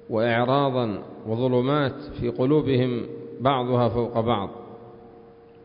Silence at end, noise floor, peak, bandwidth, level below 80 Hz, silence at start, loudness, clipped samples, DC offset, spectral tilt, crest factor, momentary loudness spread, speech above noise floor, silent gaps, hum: 0 s; -48 dBFS; -8 dBFS; 5.4 kHz; -52 dBFS; 0.1 s; -24 LUFS; under 0.1%; under 0.1%; -11.5 dB/octave; 16 dB; 13 LU; 25 dB; none; none